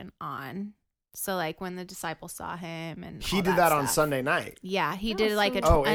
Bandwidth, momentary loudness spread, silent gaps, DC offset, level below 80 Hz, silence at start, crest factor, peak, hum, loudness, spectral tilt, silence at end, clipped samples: 19.5 kHz; 15 LU; none; under 0.1%; -40 dBFS; 0 s; 22 dB; -6 dBFS; none; -28 LUFS; -4 dB/octave; 0 s; under 0.1%